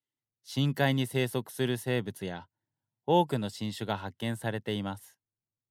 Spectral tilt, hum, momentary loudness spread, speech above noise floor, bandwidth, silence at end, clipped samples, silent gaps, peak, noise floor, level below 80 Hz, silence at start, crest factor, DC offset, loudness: -6 dB/octave; none; 12 LU; over 59 dB; 16 kHz; 0.65 s; under 0.1%; none; -12 dBFS; under -90 dBFS; -74 dBFS; 0.45 s; 20 dB; under 0.1%; -31 LUFS